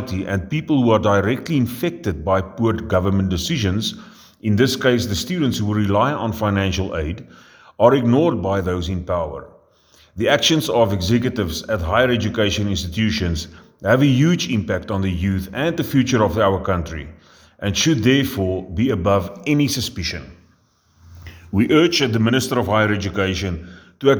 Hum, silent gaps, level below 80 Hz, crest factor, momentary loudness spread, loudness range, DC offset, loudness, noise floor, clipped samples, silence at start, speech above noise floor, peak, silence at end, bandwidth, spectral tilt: none; none; -40 dBFS; 18 dB; 9 LU; 2 LU; under 0.1%; -19 LUFS; -58 dBFS; under 0.1%; 0 s; 40 dB; 0 dBFS; 0 s; over 20 kHz; -5.5 dB/octave